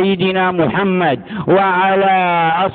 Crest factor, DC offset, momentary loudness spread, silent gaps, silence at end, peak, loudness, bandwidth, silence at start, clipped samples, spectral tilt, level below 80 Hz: 12 dB; under 0.1%; 3 LU; none; 0 s; -2 dBFS; -14 LUFS; 4.5 kHz; 0 s; under 0.1%; -11.5 dB/octave; -50 dBFS